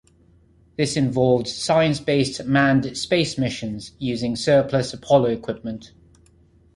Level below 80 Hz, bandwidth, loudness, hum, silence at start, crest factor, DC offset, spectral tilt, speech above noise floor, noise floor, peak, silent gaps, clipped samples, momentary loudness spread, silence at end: -52 dBFS; 11.5 kHz; -21 LUFS; none; 0.8 s; 18 dB; under 0.1%; -5.5 dB/octave; 35 dB; -55 dBFS; -4 dBFS; none; under 0.1%; 11 LU; 0.9 s